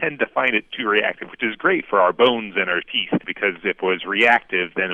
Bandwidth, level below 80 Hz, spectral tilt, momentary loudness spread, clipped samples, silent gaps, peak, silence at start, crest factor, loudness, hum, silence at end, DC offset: 8.4 kHz; -62 dBFS; -5.5 dB/octave; 7 LU; under 0.1%; none; -4 dBFS; 0 s; 18 dB; -19 LUFS; none; 0 s; under 0.1%